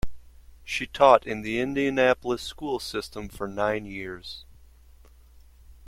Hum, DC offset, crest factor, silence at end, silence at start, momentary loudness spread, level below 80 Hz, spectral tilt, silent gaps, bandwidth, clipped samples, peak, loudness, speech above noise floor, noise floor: none; under 0.1%; 24 dB; 0.05 s; 0.05 s; 19 LU; -48 dBFS; -4.5 dB/octave; none; 16.5 kHz; under 0.1%; -2 dBFS; -25 LUFS; 27 dB; -52 dBFS